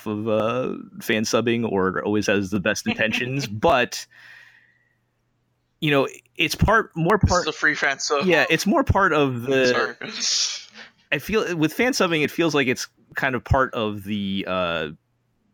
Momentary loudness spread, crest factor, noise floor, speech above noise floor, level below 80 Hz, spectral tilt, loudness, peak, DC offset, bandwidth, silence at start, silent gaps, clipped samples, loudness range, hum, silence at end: 8 LU; 18 dB; -69 dBFS; 48 dB; -40 dBFS; -4.5 dB/octave; -22 LUFS; -6 dBFS; under 0.1%; 18 kHz; 0 s; none; under 0.1%; 5 LU; none; 0.6 s